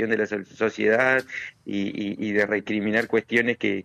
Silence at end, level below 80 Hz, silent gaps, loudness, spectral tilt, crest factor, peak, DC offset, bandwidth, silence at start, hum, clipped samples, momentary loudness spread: 0 s; -66 dBFS; none; -24 LUFS; -6 dB/octave; 16 dB; -8 dBFS; under 0.1%; 13 kHz; 0 s; none; under 0.1%; 9 LU